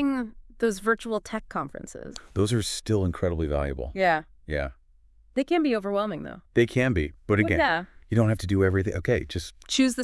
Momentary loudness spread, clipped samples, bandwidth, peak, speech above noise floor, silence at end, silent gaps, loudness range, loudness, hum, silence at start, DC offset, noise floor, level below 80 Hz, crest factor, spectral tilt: 11 LU; under 0.1%; 12 kHz; -8 dBFS; 32 dB; 0 s; none; 3 LU; -26 LUFS; none; 0 s; under 0.1%; -57 dBFS; -44 dBFS; 18 dB; -5.5 dB/octave